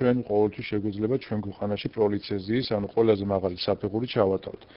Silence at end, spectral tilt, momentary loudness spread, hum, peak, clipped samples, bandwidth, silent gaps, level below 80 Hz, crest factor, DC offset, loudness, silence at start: 0.15 s; -6 dB/octave; 7 LU; none; -8 dBFS; under 0.1%; 5.6 kHz; none; -56 dBFS; 18 dB; under 0.1%; -27 LUFS; 0 s